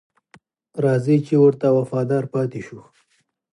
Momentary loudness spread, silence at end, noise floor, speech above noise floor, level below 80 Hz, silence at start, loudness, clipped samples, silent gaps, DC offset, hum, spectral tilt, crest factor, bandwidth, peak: 17 LU; 0.75 s; -67 dBFS; 48 dB; -66 dBFS; 0.75 s; -19 LUFS; under 0.1%; none; under 0.1%; none; -9 dB/octave; 16 dB; 11 kHz; -6 dBFS